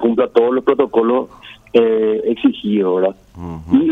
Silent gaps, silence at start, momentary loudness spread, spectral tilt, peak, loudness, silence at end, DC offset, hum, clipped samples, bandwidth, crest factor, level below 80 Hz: none; 0 s; 12 LU; -8.5 dB/octave; 0 dBFS; -16 LUFS; 0 s; under 0.1%; none; under 0.1%; 4.2 kHz; 14 dB; -48 dBFS